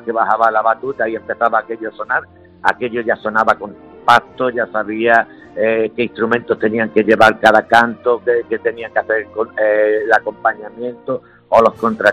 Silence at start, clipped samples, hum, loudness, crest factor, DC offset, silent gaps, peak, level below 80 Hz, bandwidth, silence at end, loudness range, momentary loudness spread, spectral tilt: 0.05 s; 0.2%; none; -15 LUFS; 16 dB; under 0.1%; none; 0 dBFS; -54 dBFS; 14 kHz; 0 s; 4 LU; 10 LU; -5 dB/octave